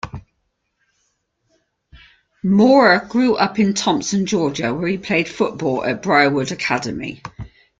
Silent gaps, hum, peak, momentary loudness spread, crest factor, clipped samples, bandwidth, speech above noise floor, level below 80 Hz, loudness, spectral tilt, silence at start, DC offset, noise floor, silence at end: none; none; 0 dBFS; 17 LU; 18 dB; under 0.1%; 9.2 kHz; 54 dB; -50 dBFS; -17 LUFS; -5 dB/octave; 0.05 s; under 0.1%; -71 dBFS; 0.3 s